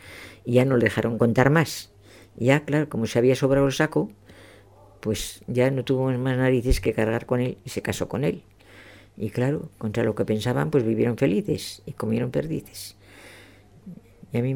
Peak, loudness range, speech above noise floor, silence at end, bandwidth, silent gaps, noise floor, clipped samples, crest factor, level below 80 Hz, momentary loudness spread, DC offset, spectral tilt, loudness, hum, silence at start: -4 dBFS; 6 LU; 28 dB; 0 s; 19.5 kHz; none; -51 dBFS; under 0.1%; 20 dB; -42 dBFS; 14 LU; under 0.1%; -6.5 dB/octave; -24 LUFS; none; 0.05 s